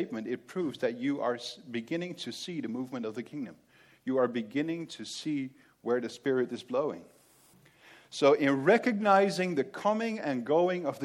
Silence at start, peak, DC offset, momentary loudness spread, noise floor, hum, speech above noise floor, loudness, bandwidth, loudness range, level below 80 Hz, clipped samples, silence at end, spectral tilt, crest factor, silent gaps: 0 s; -10 dBFS; under 0.1%; 14 LU; -61 dBFS; none; 31 dB; -31 LUFS; 13.5 kHz; 8 LU; -80 dBFS; under 0.1%; 0 s; -5.5 dB/octave; 20 dB; none